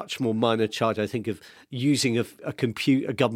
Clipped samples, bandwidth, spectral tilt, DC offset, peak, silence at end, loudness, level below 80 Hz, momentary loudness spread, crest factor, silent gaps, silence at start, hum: under 0.1%; 16 kHz; -5 dB/octave; under 0.1%; -6 dBFS; 0 s; -25 LUFS; -66 dBFS; 10 LU; 18 dB; none; 0 s; none